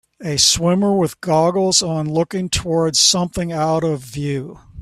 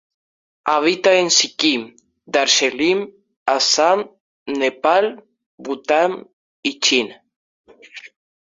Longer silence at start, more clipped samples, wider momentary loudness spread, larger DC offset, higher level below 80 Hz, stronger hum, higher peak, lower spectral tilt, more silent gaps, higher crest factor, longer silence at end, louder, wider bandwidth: second, 0.2 s vs 0.65 s; neither; second, 11 LU vs 20 LU; neither; first, -42 dBFS vs -66 dBFS; neither; about the same, 0 dBFS vs -2 dBFS; first, -3.5 dB/octave vs -1.5 dB/octave; second, none vs 3.36-3.46 s, 4.20-4.46 s, 5.46-5.58 s, 6.33-6.63 s, 7.36-7.64 s; about the same, 18 dB vs 18 dB; second, 0 s vs 0.4 s; about the same, -17 LUFS vs -17 LUFS; first, 15 kHz vs 7.8 kHz